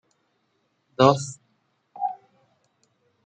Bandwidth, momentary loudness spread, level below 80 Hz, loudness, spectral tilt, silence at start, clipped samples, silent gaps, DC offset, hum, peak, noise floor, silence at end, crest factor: 9.4 kHz; 25 LU; -68 dBFS; -23 LUFS; -5.5 dB/octave; 1 s; under 0.1%; none; under 0.1%; none; -2 dBFS; -71 dBFS; 1.1 s; 24 dB